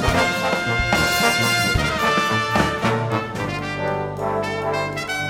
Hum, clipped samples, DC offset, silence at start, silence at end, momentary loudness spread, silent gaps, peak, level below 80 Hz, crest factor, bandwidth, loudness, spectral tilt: none; under 0.1%; under 0.1%; 0 s; 0 s; 8 LU; none; -2 dBFS; -36 dBFS; 18 dB; 19.5 kHz; -20 LUFS; -4 dB/octave